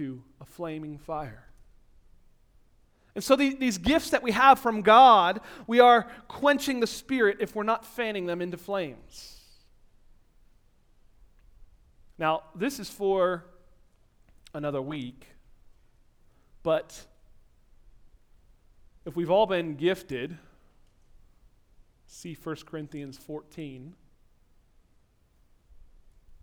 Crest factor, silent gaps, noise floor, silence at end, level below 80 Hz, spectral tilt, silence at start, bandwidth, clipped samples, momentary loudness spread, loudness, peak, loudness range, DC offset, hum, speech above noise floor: 24 dB; none; -64 dBFS; 2.5 s; -56 dBFS; -4.5 dB/octave; 0 s; 19.5 kHz; under 0.1%; 23 LU; -25 LUFS; -4 dBFS; 21 LU; under 0.1%; none; 38 dB